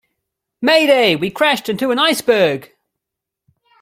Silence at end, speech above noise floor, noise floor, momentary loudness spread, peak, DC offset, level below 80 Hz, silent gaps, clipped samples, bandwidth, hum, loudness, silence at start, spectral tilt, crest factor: 1.15 s; 68 dB; -82 dBFS; 7 LU; 0 dBFS; under 0.1%; -62 dBFS; none; under 0.1%; 16.5 kHz; none; -14 LUFS; 0.6 s; -3.5 dB/octave; 16 dB